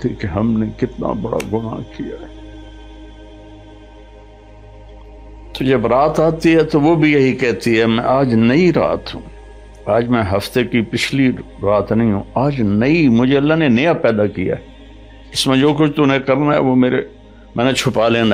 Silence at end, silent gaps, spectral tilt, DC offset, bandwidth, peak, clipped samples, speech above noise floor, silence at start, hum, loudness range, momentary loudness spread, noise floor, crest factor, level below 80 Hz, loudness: 0 s; none; -6.5 dB/octave; under 0.1%; 16 kHz; -2 dBFS; under 0.1%; 25 dB; 0 s; none; 11 LU; 13 LU; -39 dBFS; 14 dB; -40 dBFS; -15 LUFS